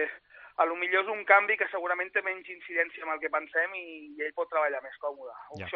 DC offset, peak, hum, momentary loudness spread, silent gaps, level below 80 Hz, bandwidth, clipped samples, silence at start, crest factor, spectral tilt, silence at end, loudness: under 0.1%; -6 dBFS; 50 Hz at -85 dBFS; 18 LU; none; -78 dBFS; 5.4 kHz; under 0.1%; 0 s; 24 dB; -0.5 dB/octave; 0 s; -29 LUFS